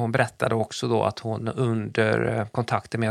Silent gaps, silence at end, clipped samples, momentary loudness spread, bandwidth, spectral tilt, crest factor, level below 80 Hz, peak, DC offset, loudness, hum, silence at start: none; 0 s; under 0.1%; 4 LU; 12.5 kHz; -6 dB/octave; 20 dB; -58 dBFS; -4 dBFS; under 0.1%; -25 LUFS; none; 0 s